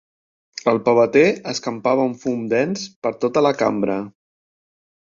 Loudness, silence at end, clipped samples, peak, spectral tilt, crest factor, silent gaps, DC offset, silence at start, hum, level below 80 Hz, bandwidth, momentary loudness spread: -19 LUFS; 0.95 s; under 0.1%; -2 dBFS; -5.5 dB/octave; 18 dB; 2.96-3.02 s; under 0.1%; 0.55 s; none; -60 dBFS; 7.6 kHz; 11 LU